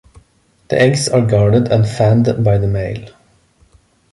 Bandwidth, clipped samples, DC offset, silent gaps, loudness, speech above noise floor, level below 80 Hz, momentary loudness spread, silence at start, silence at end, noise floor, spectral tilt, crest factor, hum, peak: 11.5 kHz; under 0.1%; under 0.1%; none; -14 LUFS; 42 dB; -38 dBFS; 8 LU; 0.7 s; 1.05 s; -55 dBFS; -6.5 dB/octave; 14 dB; none; -2 dBFS